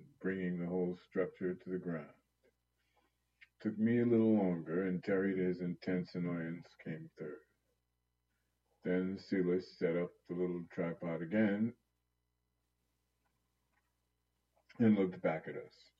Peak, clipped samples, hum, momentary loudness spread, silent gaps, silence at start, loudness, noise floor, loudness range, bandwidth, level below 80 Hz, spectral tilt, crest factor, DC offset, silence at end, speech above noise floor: -20 dBFS; under 0.1%; 60 Hz at -60 dBFS; 15 LU; none; 0 s; -37 LUFS; -84 dBFS; 8 LU; 6.6 kHz; -80 dBFS; -9.5 dB/octave; 18 dB; under 0.1%; 0.3 s; 48 dB